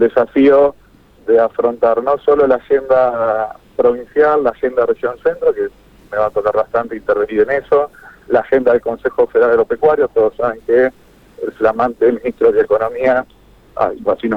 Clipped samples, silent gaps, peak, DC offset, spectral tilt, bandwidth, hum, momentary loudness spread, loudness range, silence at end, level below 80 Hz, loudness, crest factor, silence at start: under 0.1%; none; -2 dBFS; under 0.1%; -7.5 dB/octave; 5 kHz; none; 7 LU; 3 LU; 0 s; -48 dBFS; -15 LUFS; 12 dB; 0 s